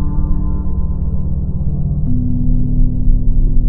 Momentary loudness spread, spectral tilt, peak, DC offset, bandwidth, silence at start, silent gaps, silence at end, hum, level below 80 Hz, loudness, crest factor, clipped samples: 3 LU; -17 dB/octave; 0 dBFS; under 0.1%; 1.2 kHz; 0 s; none; 0 s; none; -14 dBFS; -19 LUFS; 12 dB; under 0.1%